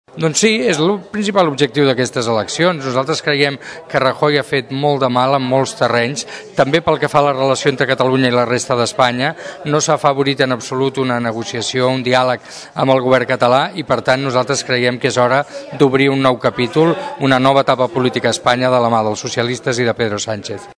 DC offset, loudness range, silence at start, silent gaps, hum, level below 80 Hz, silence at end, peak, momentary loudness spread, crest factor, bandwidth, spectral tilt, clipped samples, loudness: under 0.1%; 2 LU; 0.15 s; none; none; -54 dBFS; 0.05 s; 0 dBFS; 6 LU; 16 dB; 11 kHz; -4.5 dB/octave; 0.2%; -15 LUFS